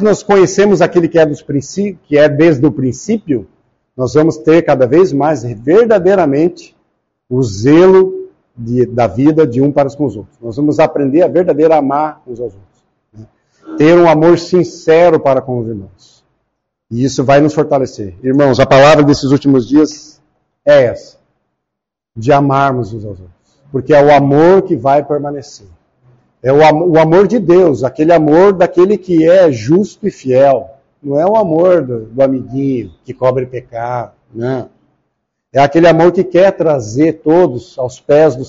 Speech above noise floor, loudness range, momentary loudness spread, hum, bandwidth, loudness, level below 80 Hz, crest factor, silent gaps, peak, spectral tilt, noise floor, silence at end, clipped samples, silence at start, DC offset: 69 dB; 5 LU; 13 LU; none; 7.8 kHz; -10 LUFS; -44 dBFS; 10 dB; none; 0 dBFS; -6.5 dB/octave; -78 dBFS; 0 s; under 0.1%; 0 s; under 0.1%